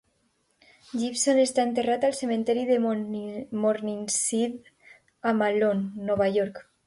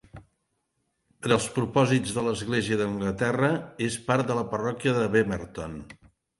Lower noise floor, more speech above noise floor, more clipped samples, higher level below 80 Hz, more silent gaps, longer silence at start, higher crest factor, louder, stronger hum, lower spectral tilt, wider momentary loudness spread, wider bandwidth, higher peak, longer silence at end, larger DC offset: second, -70 dBFS vs -76 dBFS; second, 45 dB vs 50 dB; neither; second, -66 dBFS vs -54 dBFS; neither; first, 0.95 s vs 0.15 s; second, 14 dB vs 20 dB; about the same, -26 LUFS vs -26 LUFS; neither; second, -4 dB/octave vs -5.5 dB/octave; about the same, 9 LU vs 11 LU; about the same, 11.5 kHz vs 11.5 kHz; second, -12 dBFS vs -8 dBFS; second, 0.25 s vs 0.45 s; neither